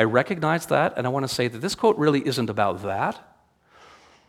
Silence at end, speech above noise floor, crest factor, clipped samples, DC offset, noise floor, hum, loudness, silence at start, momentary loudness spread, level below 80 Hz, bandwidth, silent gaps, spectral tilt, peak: 1.1 s; 35 dB; 22 dB; under 0.1%; under 0.1%; -58 dBFS; none; -23 LUFS; 0 s; 6 LU; -62 dBFS; 17 kHz; none; -5.5 dB/octave; -2 dBFS